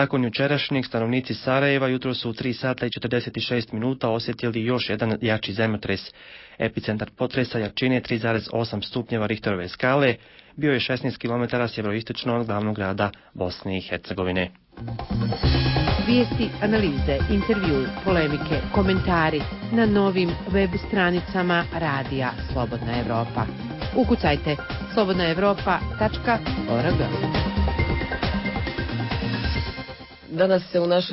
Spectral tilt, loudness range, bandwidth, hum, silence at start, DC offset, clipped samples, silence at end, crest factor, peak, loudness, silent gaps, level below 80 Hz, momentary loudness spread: -10.5 dB/octave; 4 LU; 5.8 kHz; none; 0 s; under 0.1%; under 0.1%; 0 s; 16 dB; -8 dBFS; -24 LUFS; none; -36 dBFS; 8 LU